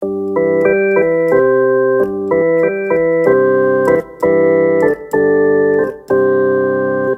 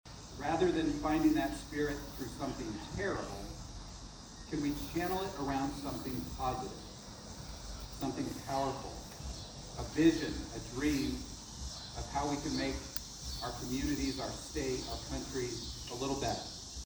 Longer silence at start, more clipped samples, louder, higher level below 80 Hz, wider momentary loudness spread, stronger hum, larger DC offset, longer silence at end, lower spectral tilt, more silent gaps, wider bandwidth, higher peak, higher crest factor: about the same, 0 s vs 0.05 s; neither; first, -13 LUFS vs -37 LUFS; about the same, -52 dBFS vs -50 dBFS; second, 4 LU vs 14 LU; neither; neither; about the same, 0 s vs 0 s; first, -9 dB/octave vs -4.5 dB/octave; neither; second, 8 kHz vs over 20 kHz; first, 0 dBFS vs -14 dBFS; second, 12 dB vs 22 dB